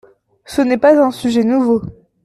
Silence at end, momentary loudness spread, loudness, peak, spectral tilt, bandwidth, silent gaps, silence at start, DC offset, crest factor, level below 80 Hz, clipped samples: 0.35 s; 9 LU; -14 LUFS; 0 dBFS; -6 dB/octave; 13 kHz; none; 0.5 s; under 0.1%; 14 dB; -50 dBFS; under 0.1%